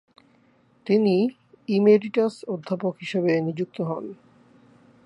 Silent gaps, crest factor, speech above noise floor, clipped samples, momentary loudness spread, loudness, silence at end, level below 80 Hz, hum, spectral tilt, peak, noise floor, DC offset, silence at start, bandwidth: none; 20 dB; 38 dB; under 0.1%; 15 LU; -23 LUFS; 0.9 s; -74 dBFS; none; -8 dB/octave; -6 dBFS; -60 dBFS; under 0.1%; 0.85 s; 10.5 kHz